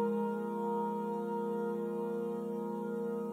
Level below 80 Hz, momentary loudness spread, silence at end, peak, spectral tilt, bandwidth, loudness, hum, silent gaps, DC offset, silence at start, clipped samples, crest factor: -86 dBFS; 3 LU; 0 s; -24 dBFS; -8.5 dB/octave; 16 kHz; -37 LUFS; none; none; under 0.1%; 0 s; under 0.1%; 12 dB